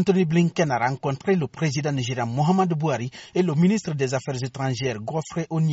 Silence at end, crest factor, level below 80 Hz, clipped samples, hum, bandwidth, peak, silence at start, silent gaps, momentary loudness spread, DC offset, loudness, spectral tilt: 0 s; 16 dB; -58 dBFS; under 0.1%; none; 8 kHz; -8 dBFS; 0 s; none; 8 LU; under 0.1%; -24 LUFS; -6.5 dB/octave